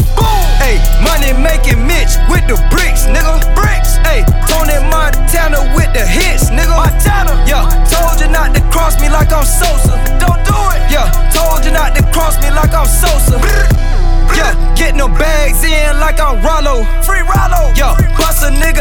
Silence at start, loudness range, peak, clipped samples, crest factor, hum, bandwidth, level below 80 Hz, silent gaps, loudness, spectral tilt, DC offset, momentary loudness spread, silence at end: 0 s; 1 LU; 0 dBFS; under 0.1%; 6 dB; none; 18.5 kHz; -8 dBFS; none; -11 LUFS; -4 dB/octave; under 0.1%; 2 LU; 0 s